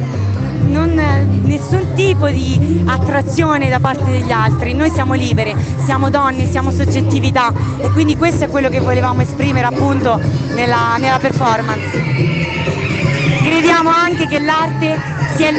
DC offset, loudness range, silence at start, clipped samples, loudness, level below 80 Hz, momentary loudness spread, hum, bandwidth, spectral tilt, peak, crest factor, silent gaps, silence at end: under 0.1%; 1 LU; 0 s; under 0.1%; -14 LUFS; -36 dBFS; 4 LU; none; 8.6 kHz; -6.5 dB/octave; 0 dBFS; 14 dB; none; 0 s